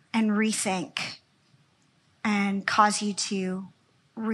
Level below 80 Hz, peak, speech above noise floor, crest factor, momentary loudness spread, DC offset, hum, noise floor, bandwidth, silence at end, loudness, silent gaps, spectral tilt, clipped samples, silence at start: -78 dBFS; -6 dBFS; 39 dB; 22 dB; 15 LU; under 0.1%; none; -65 dBFS; 12.5 kHz; 0 s; -27 LUFS; none; -3.5 dB/octave; under 0.1%; 0.15 s